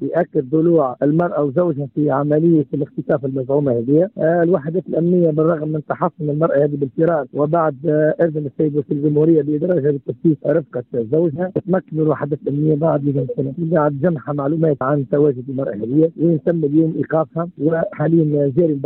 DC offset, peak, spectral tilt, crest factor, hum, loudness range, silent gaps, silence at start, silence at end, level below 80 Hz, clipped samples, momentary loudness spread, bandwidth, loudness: under 0.1%; -4 dBFS; -13 dB/octave; 12 dB; none; 2 LU; none; 0 s; 0 s; -58 dBFS; under 0.1%; 6 LU; 3.9 kHz; -18 LUFS